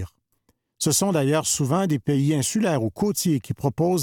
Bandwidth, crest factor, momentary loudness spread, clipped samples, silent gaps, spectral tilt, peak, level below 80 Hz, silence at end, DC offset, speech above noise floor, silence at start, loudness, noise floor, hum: 18.5 kHz; 16 dB; 4 LU; under 0.1%; none; -5 dB/octave; -8 dBFS; -56 dBFS; 0 s; under 0.1%; 47 dB; 0 s; -22 LUFS; -68 dBFS; none